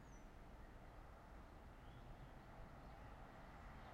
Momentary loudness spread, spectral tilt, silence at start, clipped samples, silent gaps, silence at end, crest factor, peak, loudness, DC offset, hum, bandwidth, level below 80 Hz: 2 LU; -6 dB/octave; 0 s; under 0.1%; none; 0 s; 14 dB; -46 dBFS; -61 LUFS; under 0.1%; none; 15.5 kHz; -62 dBFS